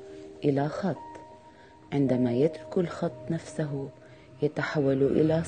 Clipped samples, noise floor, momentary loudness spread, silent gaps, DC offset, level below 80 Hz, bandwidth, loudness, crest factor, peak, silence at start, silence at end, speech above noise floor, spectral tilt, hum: under 0.1%; -52 dBFS; 14 LU; none; under 0.1%; -60 dBFS; 9.6 kHz; -28 LUFS; 18 dB; -10 dBFS; 0 s; 0 s; 25 dB; -8 dB/octave; none